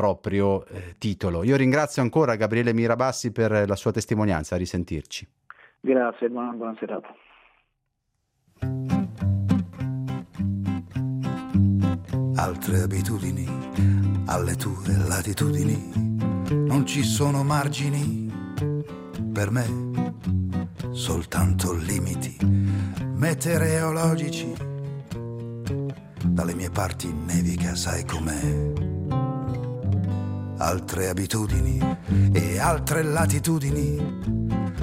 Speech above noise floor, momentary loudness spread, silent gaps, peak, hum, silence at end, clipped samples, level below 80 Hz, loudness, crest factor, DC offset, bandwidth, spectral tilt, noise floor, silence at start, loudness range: 52 dB; 9 LU; none; -4 dBFS; none; 0 s; under 0.1%; -42 dBFS; -25 LUFS; 20 dB; under 0.1%; 16 kHz; -6 dB/octave; -76 dBFS; 0 s; 6 LU